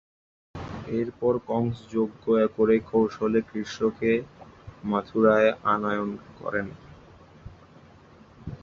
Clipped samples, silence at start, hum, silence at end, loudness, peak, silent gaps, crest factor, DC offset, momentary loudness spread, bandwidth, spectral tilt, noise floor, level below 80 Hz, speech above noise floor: under 0.1%; 0.55 s; none; 0.05 s; -25 LUFS; -8 dBFS; none; 20 dB; under 0.1%; 17 LU; 7.2 kHz; -7.5 dB/octave; -52 dBFS; -54 dBFS; 27 dB